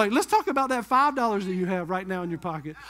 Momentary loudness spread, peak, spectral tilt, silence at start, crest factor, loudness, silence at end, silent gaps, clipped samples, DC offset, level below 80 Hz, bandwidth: 10 LU; -8 dBFS; -5 dB/octave; 0 s; 18 dB; -25 LUFS; 0 s; none; under 0.1%; under 0.1%; -60 dBFS; 16 kHz